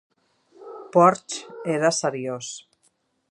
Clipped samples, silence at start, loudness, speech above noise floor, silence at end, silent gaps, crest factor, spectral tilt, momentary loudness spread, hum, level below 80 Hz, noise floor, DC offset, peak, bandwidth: under 0.1%; 0.6 s; -22 LUFS; 45 dB; 0.7 s; none; 22 dB; -4.5 dB/octave; 22 LU; none; -76 dBFS; -67 dBFS; under 0.1%; -2 dBFS; 11 kHz